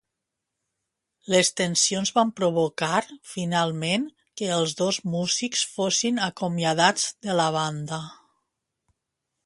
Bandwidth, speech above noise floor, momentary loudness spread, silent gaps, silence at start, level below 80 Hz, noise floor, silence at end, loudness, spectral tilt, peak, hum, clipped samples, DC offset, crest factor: 11.5 kHz; 59 dB; 11 LU; none; 1.3 s; -68 dBFS; -83 dBFS; 1.3 s; -24 LUFS; -3 dB/octave; -4 dBFS; none; under 0.1%; under 0.1%; 22 dB